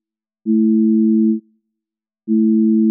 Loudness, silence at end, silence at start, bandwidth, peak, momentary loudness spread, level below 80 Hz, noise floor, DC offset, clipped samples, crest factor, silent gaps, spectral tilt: -15 LUFS; 0 s; 0.45 s; 0.4 kHz; -8 dBFS; 11 LU; -88 dBFS; -86 dBFS; under 0.1%; under 0.1%; 8 dB; none; -21 dB/octave